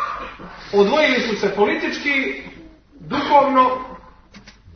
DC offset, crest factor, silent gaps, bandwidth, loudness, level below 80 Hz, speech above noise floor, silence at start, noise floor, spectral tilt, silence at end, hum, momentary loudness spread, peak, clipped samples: under 0.1%; 18 dB; none; 6.6 kHz; -18 LUFS; -50 dBFS; 28 dB; 0 s; -45 dBFS; -5 dB/octave; 0.25 s; none; 18 LU; -2 dBFS; under 0.1%